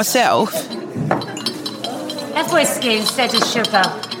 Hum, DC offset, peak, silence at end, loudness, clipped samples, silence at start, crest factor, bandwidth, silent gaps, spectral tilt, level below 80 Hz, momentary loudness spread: none; under 0.1%; -2 dBFS; 0 s; -18 LUFS; under 0.1%; 0 s; 16 dB; 17 kHz; none; -3 dB/octave; -64 dBFS; 10 LU